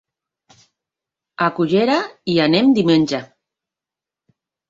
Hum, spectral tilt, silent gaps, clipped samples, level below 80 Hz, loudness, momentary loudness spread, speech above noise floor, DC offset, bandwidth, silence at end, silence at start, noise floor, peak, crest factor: none; -6 dB/octave; none; under 0.1%; -60 dBFS; -17 LUFS; 7 LU; 72 dB; under 0.1%; 7.6 kHz; 1.45 s; 1.4 s; -88 dBFS; -2 dBFS; 18 dB